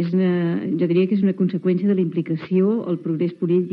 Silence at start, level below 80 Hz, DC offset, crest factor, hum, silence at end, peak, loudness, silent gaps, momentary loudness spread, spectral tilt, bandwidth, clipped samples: 0 s; -78 dBFS; under 0.1%; 12 dB; none; 0 s; -8 dBFS; -21 LUFS; none; 4 LU; -11 dB/octave; 5 kHz; under 0.1%